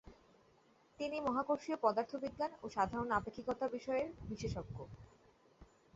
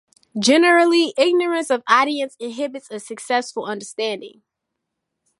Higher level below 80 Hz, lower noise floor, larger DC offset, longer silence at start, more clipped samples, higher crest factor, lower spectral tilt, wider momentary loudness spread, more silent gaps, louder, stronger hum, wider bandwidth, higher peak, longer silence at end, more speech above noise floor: first, -62 dBFS vs -76 dBFS; second, -70 dBFS vs -80 dBFS; neither; second, 0.05 s vs 0.35 s; neither; about the same, 22 dB vs 18 dB; first, -5 dB/octave vs -3 dB/octave; second, 10 LU vs 18 LU; neither; second, -39 LUFS vs -18 LUFS; neither; second, 8 kHz vs 11.5 kHz; second, -18 dBFS vs -2 dBFS; second, 0.3 s vs 1.1 s; second, 31 dB vs 61 dB